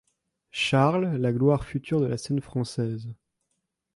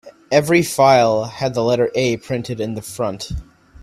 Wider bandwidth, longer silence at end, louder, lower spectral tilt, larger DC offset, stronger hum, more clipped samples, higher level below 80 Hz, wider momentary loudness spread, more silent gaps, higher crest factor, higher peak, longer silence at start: second, 11.5 kHz vs 16 kHz; first, 0.8 s vs 0 s; second, -26 LUFS vs -17 LUFS; first, -6.5 dB/octave vs -5 dB/octave; neither; neither; neither; second, -54 dBFS vs -42 dBFS; about the same, 11 LU vs 13 LU; neither; about the same, 18 dB vs 18 dB; second, -10 dBFS vs 0 dBFS; first, 0.55 s vs 0.05 s